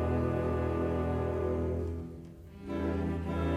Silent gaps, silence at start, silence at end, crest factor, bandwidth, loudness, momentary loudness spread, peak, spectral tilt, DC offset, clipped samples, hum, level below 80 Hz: none; 0 s; 0 s; 14 dB; 8 kHz; -33 LUFS; 14 LU; -18 dBFS; -9 dB/octave; under 0.1%; under 0.1%; none; -42 dBFS